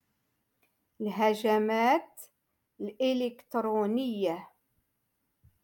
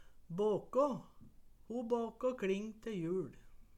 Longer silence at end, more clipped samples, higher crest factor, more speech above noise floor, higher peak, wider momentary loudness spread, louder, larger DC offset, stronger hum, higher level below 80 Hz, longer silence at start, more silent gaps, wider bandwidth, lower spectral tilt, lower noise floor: first, 1.2 s vs 0.15 s; neither; about the same, 18 dB vs 18 dB; first, 50 dB vs 21 dB; first, -14 dBFS vs -22 dBFS; first, 15 LU vs 11 LU; first, -29 LUFS vs -38 LUFS; neither; neither; second, -78 dBFS vs -64 dBFS; first, 1 s vs 0 s; neither; first, 17.5 kHz vs 13.5 kHz; second, -5.5 dB/octave vs -7 dB/octave; first, -79 dBFS vs -58 dBFS